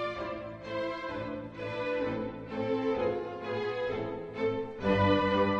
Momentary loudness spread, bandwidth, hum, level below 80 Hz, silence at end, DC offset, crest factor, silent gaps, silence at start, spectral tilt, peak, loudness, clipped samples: 12 LU; 7.8 kHz; none; -56 dBFS; 0 s; under 0.1%; 18 dB; none; 0 s; -7.5 dB/octave; -14 dBFS; -32 LUFS; under 0.1%